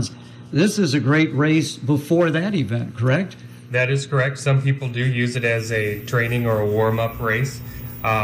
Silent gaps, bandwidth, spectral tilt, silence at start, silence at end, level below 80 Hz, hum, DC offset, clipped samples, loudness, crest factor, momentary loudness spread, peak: none; 16 kHz; -6 dB/octave; 0 s; 0 s; -48 dBFS; none; under 0.1%; under 0.1%; -20 LUFS; 12 dB; 8 LU; -8 dBFS